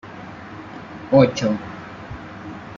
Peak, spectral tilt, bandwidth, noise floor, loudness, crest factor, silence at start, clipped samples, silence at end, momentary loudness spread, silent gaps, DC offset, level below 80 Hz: -2 dBFS; -6.5 dB/octave; 7.4 kHz; -37 dBFS; -18 LUFS; 20 dB; 0.05 s; under 0.1%; 0 s; 21 LU; none; under 0.1%; -52 dBFS